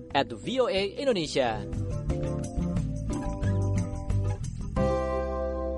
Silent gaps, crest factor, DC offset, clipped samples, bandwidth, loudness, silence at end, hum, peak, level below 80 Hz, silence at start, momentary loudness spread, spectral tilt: none; 20 dB; under 0.1%; under 0.1%; 11.5 kHz; -29 LUFS; 0 s; none; -10 dBFS; -36 dBFS; 0 s; 6 LU; -6.5 dB/octave